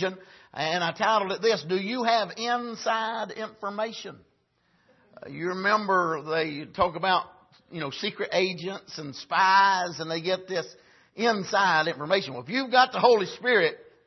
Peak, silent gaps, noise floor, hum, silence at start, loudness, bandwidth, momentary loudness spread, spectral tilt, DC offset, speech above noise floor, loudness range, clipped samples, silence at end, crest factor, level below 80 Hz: -6 dBFS; none; -69 dBFS; none; 0 s; -25 LUFS; 6.2 kHz; 14 LU; -4 dB/octave; under 0.1%; 43 dB; 5 LU; under 0.1%; 0.25 s; 22 dB; -64 dBFS